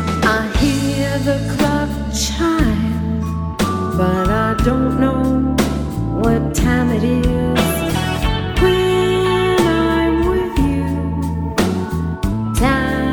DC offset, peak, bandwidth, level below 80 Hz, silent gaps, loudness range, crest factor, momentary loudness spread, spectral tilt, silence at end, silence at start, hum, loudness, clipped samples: under 0.1%; -2 dBFS; 19 kHz; -26 dBFS; none; 2 LU; 16 dB; 6 LU; -6 dB/octave; 0 s; 0 s; none; -17 LUFS; under 0.1%